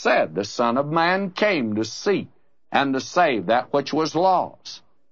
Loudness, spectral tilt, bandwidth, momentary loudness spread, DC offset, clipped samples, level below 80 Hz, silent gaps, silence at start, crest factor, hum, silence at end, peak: -22 LUFS; -5 dB/octave; 7.8 kHz; 9 LU; 0.2%; under 0.1%; -70 dBFS; none; 0 s; 18 dB; none; 0.35 s; -4 dBFS